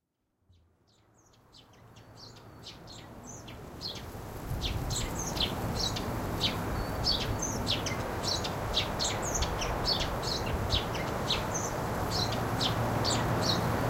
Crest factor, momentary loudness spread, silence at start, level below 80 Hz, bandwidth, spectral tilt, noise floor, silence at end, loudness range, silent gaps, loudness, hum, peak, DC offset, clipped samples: 16 dB; 17 LU; 1.55 s; -42 dBFS; 16 kHz; -3.5 dB/octave; -75 dBFS; 0 s; 15 LU; none; -31 LUFS; none; -16 dBFS; under 0.1%; under 0.1%